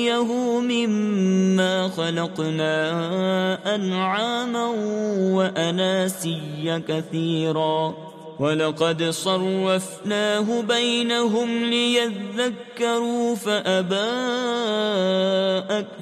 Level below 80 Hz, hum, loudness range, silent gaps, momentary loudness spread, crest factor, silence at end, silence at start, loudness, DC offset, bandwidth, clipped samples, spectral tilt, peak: -72 dBFS; none; 2 LU; none; 5 LU; 16 dB; 0 s; 0 s; -22 LUFS; under 0.1%; 14 kHz; under 0.1%; -5 dB/octave; -6 dBFS